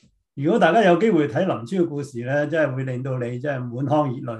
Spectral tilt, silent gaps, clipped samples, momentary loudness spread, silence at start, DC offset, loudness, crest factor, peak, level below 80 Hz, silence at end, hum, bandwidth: -7.5 dB/octave; none; under 0.1%; 11 LU; 0.35 s; under 0.1%; -21 LUFS; 18 dB; -4 dBFS; -66 dBFS; 0 s; none; 10.5 kHz